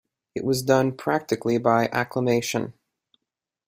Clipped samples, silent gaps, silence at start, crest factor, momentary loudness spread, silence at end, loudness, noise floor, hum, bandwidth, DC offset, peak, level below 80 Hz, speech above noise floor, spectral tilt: under 0.1%; none; 0.35 s; 20 dB; 9 LU; 0.95 s; -23 LUFS; -86 dBFS; none; 16 kHz; under 0.1%; -4 dBFS; -62 dBFS; 63 dB; -5.5 dB/octave